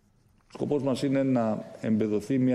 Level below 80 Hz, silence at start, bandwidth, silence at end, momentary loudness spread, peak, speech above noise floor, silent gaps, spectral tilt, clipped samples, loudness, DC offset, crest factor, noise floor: -66 dBFS; 0.55 s; 12 kHz; 0 s; 6 LU; -14 dBFS; 37 dB; none; -7.5 dB/octave; under 0.1%; -28 LUFS; under 0.1%; 14 dB; -63 dBFS